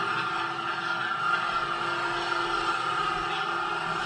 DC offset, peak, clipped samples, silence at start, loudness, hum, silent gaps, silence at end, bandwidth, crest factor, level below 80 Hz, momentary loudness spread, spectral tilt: under 0.1%; -14 dBFS; under 0.1%; 0 s; -28 LUFS; none; none; 0 s; 10.5 kHz; 14 dB; -58 dBFS; 3 LU; -3 dB/octave